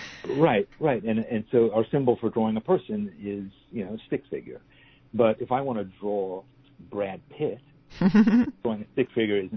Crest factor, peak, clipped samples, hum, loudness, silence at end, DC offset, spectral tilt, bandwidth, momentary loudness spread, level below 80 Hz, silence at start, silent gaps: 18 dB; -8 dBFS; under 0.1%; none; -26 LUFS; 0 s; under 0.1%; -8.5 dB/octave; 6.4 kHz; 14 LU; -58 dBFS; 0 s; none